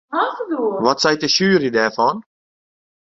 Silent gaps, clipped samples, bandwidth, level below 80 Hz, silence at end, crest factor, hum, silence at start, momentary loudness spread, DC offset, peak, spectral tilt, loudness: none; under 0.1%; 7.8 kHz; -60 dBFS; 0.95 s; 18 dB; none; 0.1 s; 7 LU; under 0.1%; -2 dBFS; -4 dB/octave; -17 LUFS